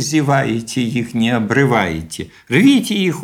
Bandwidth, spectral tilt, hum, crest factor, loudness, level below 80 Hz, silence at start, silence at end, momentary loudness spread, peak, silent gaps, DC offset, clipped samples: 16.5 kHz; -5.5 dB/octave; none; 14 dB; -16 LUFS; -46 dBFS; 0 s; 0 s; 10 LU; 0 dBFS; none; under 0.1%; under 0.1%